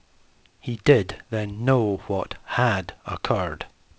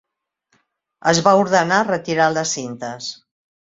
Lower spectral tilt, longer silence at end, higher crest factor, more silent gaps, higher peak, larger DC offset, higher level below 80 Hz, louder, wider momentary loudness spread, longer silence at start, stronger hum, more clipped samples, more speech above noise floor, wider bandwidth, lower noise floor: first, -7 dB/octave vs -3.5 dB/octave; second, 0.3 s vs 0.5 s; about the same, 20 dB vs 18 dB; neither; about the same, -4 dBFS vs -2 dBFS; neither; first, -46 dBFS vs -60 dBFS; second, -24 LUFS vs -18 LUFS; about the same, 14 LU vs 14 LU; second, 0.65 s vs 1.05 s; neither; neither; second, 34 dB vs 52 dB; about the same, 8 kHz vs 8 kHz; second, -57 dBFS vs -70 dBFS